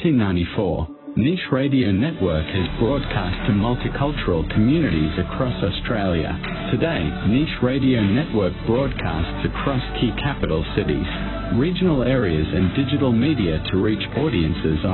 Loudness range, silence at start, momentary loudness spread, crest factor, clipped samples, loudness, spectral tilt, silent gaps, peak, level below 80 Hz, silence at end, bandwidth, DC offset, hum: 2 LU; 0 s; 5 LU; 14 dB; under 0.1%; -21 LUFS; -12 dB/octave; none; -6 dBFS; -32 dBFS; 0 s; 4.3 kHz; under 0.1%; none